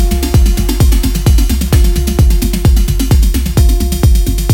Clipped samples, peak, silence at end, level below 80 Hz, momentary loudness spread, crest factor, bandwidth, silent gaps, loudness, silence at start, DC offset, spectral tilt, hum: under 0.1%; 0 dBFS; 0 s; -10 dBFS; 1 LU; 8 dB; 17 kHz; none; -12 LUFS; 0 s; under 0.1%; -5.5 dB/octave; none